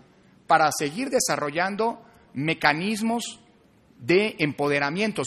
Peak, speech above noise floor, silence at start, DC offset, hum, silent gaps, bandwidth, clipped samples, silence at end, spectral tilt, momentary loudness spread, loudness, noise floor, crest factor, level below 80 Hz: -4 dBFS; 33 dB; 0.5 s; under 0.1%; none; none; 13 kHz; under 0.1%; 0 s; -4 dB/octave; 9 LU; -24 LUFS; -57 dBFS; 22 dB; -64 dBFS